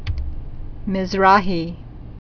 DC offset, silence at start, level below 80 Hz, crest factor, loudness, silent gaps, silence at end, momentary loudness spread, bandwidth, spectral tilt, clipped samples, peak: under 0.1%; 0 s; -30 dBFS; 20 dB; -19 LUFS; none; 0.05 s; 23 LU; 5.4 kHz; -6.5 dB/octave; under 0.1%; 0 dBFS